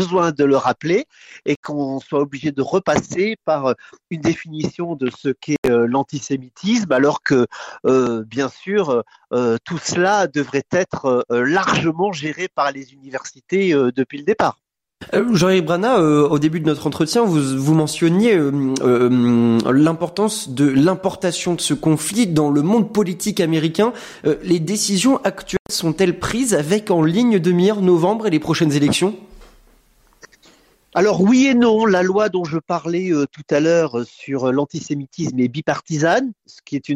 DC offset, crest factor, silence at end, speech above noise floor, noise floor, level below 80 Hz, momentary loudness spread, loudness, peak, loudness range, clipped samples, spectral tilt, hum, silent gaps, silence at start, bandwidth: under 0.1%; 14 dB; 0 s; 37 dB; -55 dBFS; -54 dBFS; 9 LU; -18 LUFS; -4 dBFS; 5 LU; under 0.1%; -5.5 dB/octave; none; 1.56-1.63 s, 5.58-5.63 s, 25.60-25.65 s; 0 s; 16 kHz